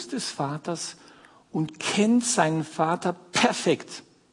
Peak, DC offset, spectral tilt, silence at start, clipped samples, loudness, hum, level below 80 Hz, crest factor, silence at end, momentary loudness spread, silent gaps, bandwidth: -4 dBFS; under 0.1%; -4 dB/octave; 0 s; under 0.1%; -25 LUFS; none; -70 dBFS; 22 dB; 0.3 s; 12 LU; none; 11 kHz